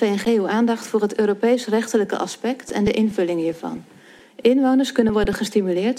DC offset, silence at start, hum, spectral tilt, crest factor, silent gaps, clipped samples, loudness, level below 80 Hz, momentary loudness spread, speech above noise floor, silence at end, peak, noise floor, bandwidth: under 0.1%; 0 s; none; -5.5 dB/octave; 16 dB; none; under 0.1%; -20 LUFS; -44 dBFS; 7 LU; 24 dB; 0 s; -4 dBFS; -44 dBFS; 15 kHz